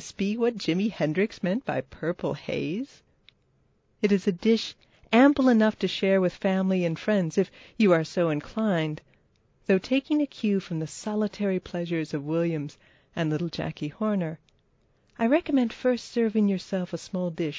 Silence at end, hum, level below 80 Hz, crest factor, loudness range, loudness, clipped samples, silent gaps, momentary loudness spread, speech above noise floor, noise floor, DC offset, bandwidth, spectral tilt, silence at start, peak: 0 s; none; -62 dBFS; 20 dB; 6 LU; -26 LUFS; under 0.1%; none; 10 LU; 41 dB; -67 dBFS; under 0.1%; 8 kHz; -6.5 dB/octave; 0 s; -6 dBFS